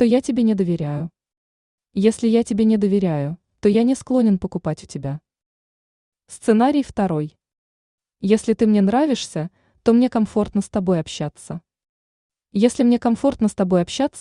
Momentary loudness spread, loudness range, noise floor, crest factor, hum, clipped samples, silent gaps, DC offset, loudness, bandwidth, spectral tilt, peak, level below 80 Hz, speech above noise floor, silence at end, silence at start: 13 LU; 3 LU; under -90 dBFS; 18 dB; none; under 0.1%; 1.37-1.78 s, 5.46-6.12 s, 7.58-7.98 s, 11.89-12.30 s; under 0.1%; -20 LUFS; 11 kHz; -6.5 dB/octave; -2 dBFS; -52 dBFS; over 72 dB; 0 s; 0 s